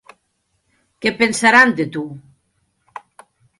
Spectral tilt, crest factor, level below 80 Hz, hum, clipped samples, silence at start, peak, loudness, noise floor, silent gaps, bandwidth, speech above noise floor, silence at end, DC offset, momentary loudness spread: -3.5 dB/octave; 20 dB; -62 dBFS; none; under 0.1%; 1 s; 0 dBFS; -15 LUFS; -69 dBFS; none; 11.5 kHz; 53 dB; 1.4 s; under 0.1%; 25 LU